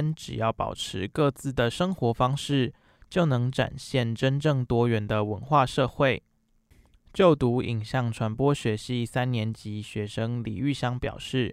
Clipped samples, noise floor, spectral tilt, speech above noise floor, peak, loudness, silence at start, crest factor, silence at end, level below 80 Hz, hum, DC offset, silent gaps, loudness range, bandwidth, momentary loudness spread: under 0.1%; -63 dBFS; -6.5 dB/octave; 37 dB; -6 dBFS; -27 LUFS; 0 s; 20 dB; 0 s; -50 dBFS; none; under 0.1%; none; 3 LU; 13.5 kHz; 8 LU